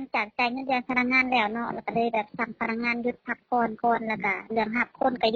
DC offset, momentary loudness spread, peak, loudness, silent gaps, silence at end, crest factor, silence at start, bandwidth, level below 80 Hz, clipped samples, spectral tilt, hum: under 0.1%; 8 LU; -10 dBFS; -26 LUFS; none; 0 s; 16 dB; 0 s; 6.8 kHz; -62 dBFS; under 0.1%; -2 dB/octave; none